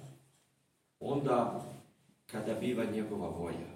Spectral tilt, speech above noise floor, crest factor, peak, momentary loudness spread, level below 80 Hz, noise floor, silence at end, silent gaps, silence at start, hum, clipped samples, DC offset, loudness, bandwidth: -7 dB/octave; 41 dB; 20 dB; -16 dBFS; 16 LU; -74 dBFS; -76 dBFS; 0 s; none; 0 s; none; under 0.1%; under 0.1%; -36 LUFS; 16 kHz